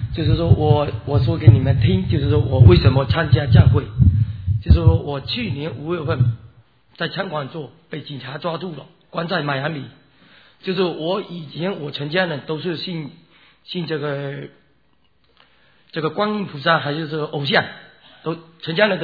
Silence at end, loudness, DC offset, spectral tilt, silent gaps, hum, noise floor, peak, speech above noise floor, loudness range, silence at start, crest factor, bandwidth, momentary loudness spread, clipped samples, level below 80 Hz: 0 s; -19 LUFS; under 0.1%; -10 dB/octave; none; none; -63 dBFS; 0 dBFS; 45 dB; 12 LU; 0 s; 18 dB; 5 kHz; 18 LU; under 0.1%; -32 dBFS